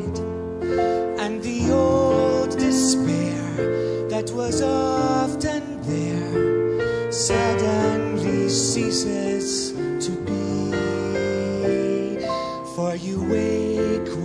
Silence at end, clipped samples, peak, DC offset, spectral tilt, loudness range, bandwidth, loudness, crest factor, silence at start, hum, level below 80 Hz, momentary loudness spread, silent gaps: 0 s; under 0.1%; -6 dBFS; under 0.1%; -5 dB/octave; 3 LU; 11 kHz; -22 LUFS; 14 dB; 0 s; none; -46 dBFS; 7 LU; none